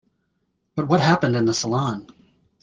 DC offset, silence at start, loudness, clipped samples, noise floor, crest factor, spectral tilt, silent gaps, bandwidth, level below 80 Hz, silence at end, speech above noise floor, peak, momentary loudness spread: under 0.1%; 0.75 s; -21 LUFS; under 0.1%; -72 dBFS; 20 dB; -5.5 dB/octave; none; 9.8 kHz; -58 dBFS; 0.6 s; 52 dB; -4 dBFS; 13 LU